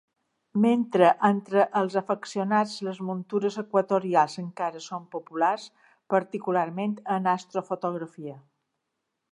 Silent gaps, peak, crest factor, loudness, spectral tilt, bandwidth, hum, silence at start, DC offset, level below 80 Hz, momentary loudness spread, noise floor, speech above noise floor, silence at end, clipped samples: none; -6 dBFS; 22 dB; -26 LUFS; -6.5 dB/octave; 11 kHz; none; 0.55 s; under 0.1%; -80 dBFS; 13 LU; -81 dBFS; 56 dB; 0.9 s; under 0.1%